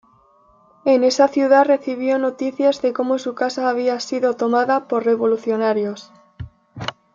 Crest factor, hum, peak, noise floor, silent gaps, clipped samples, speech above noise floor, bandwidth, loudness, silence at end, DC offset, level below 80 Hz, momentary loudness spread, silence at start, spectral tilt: 18 dB; none; -2 dBFS; -54 dBFS; none; under 0.1%; 36 dB; 7.6 kHz; -18 LUFS; 0.25 s; under 0.1%; -58 dBFS; 16 LU; 0.85 s; -5 dB/octave